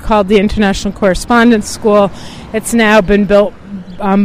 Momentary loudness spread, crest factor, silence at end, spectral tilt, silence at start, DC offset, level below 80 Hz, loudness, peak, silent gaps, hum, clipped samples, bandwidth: 11 LU; 10 dB; 0 s; -5 dB/octave; 0 s; under 0.1%; -28 dBFS; -11 LUFS; 0 dBFS; none; none; under 0.1%; 16 kHz